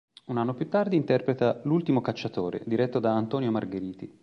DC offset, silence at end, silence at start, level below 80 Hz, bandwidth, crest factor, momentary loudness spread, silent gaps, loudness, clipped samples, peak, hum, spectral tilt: under 0.1%; 0.15 s; 0.3 s; -66 dBFS; 6.8 kHz; 16 dB; 8 LU; none; -27 LUFS; under 0.1%; -10 dBFS; none; -8.5 dB/octave